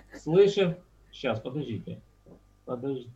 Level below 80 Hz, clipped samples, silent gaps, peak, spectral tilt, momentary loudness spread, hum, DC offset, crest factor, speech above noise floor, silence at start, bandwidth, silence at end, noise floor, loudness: -60 dBFS; under 0.1%; none; -10 dBFS; -7 dB/octave; 20 LU; none; under 0.1%; 18 dB; 29 dB; 0.15 s; 8 kHz; 0.05 s; -56 dBFS; -28 LUFS